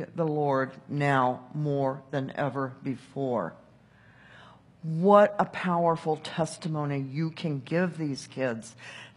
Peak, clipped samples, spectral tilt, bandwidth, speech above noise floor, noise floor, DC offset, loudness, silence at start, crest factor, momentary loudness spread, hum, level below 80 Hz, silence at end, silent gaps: -6 dBFS; under 0.1%; -7 dB/octave; 11.5 kHz; 29 dB; -57 dBFS; under 0.1%; -28 LUFS; 0 s; 24 dB; 10 LU; none; -72 dBFS; 0.1 s; none